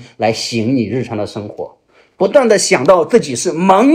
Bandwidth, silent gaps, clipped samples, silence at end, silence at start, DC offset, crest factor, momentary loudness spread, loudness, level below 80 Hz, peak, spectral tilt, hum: 15 kHz; none; 0.2%; 0 s; 0 s; under 0.1%; 14 dB; 15 LU; -13 LUFS; -54 dBFS; 0 dBFS; -4.5 dB/octave; none